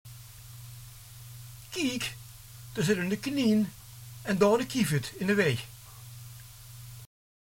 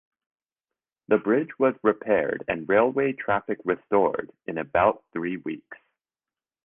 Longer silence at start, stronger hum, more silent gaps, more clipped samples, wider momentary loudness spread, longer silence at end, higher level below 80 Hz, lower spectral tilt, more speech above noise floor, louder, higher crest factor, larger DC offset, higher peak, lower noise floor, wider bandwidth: second, 0.05 s vs 1.1 s; neither; neither; neither; first, 21 LU vs 11 LU; second, 0.5 s vs 0.9 s; about the same, -58 dBFS vs -58 dBFS; second, -5 dB/octave vs -9.5 dB/octave; second, 20 dB vs over 66 dB; second, -29 LUFS vs -25 LUFS; about the same, 20 dB vs 20 dB; neither; second, -10 dBFS vs -6 dBFS; second, -47 dBFS vs under -90 dBFS; first, 17 kHz vs 3.7 kHz